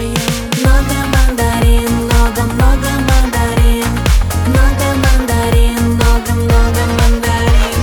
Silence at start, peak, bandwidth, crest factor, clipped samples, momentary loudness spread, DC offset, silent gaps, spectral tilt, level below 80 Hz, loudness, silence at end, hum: 0 s; 0 dBFS; 19.5 kHz; 10 dB; under 0.1%; 2 LU; under 0.1%; none; -5 dB/octave; -12 dBFS; -13 LUFS; 0 s; none